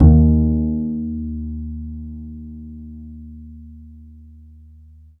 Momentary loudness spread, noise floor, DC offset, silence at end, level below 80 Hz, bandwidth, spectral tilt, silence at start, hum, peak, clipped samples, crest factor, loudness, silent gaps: 25 LU; -45 dBFS; under 0.1%; 1.1 s; -24 dBFS; 1.5 kHz; -15 dB/octave; 0 s; none; 0 dBFS; under 0.1%; 20 dB; -20 LUFS; none